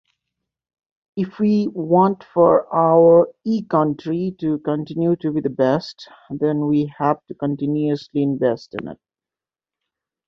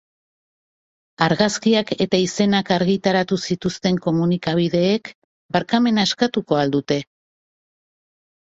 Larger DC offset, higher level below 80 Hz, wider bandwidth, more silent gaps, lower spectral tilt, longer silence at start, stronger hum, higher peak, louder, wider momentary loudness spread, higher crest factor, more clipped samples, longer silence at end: neither; about the same, -60 dBFS vs -56 dBFS; second, 6.6 kHz vs 8 kHz; second, none vs 5.15-5.49 s; first, -9 dB/octave vs -5.5 dB/octave; about the same, 1.15 s vs 1.2 s; neither; about the same, -2 dBFS vs -2 dBFS; about the same, -19 LUFS vs -19 LUFS; first, 12 LU vs 6 LU; about the same, 18 dB vs 18 dB; neither; second, 1.35 s vs 1.55 s